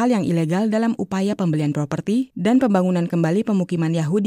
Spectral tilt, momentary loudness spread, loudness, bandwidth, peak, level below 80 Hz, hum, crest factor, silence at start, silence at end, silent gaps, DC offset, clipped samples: -7.5 dB/octave; 5 LU; -20 LUFS; 14.5 kHz; -4 dBFS; -60 dBFS; none; 14 dB; 0 s; 0 s; none; under 0.1%; under 0.1%